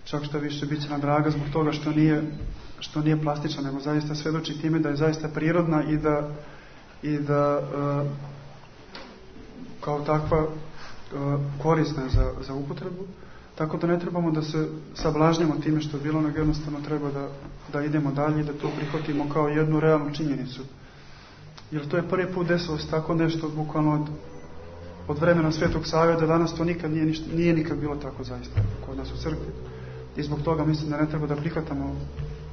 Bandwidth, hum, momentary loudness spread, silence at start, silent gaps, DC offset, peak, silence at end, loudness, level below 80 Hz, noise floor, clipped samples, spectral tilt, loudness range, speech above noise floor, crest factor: 6.6 kHz; none; 17 LU; 0 s; none; under 0.1%; -6 dBFS; 0 s; -26 LUFS; -42 dBFS; -46 dBFS; under 0.1%; -7.5 dB/octave; 4 LU; 21 dB; 20 dB